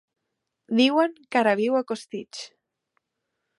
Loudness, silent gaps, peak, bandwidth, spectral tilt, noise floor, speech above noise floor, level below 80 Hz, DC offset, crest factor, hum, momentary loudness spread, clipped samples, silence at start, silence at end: -23 LUFS; none; -6 dBFS; 11.5 kHz; -4.5 dB/octave; -81 dBFS; 58 dB; -80 dBFS; under 0.1%; 20 dB; none; 18 LU; under 0.1%; 0.7 s; 1.15 s